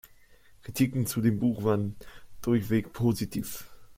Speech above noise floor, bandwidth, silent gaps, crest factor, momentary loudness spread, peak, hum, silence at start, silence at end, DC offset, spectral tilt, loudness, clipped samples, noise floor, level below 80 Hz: 28 dB; 16.5 kHz; none; 18 dB; 13 LU; -12 dBFS; none; 0.05 s; 0.05 s; under 0.1%; -6.5 dB/octave; -29 LUFS; under 0.1%; -55 dBFS; -54 dBFS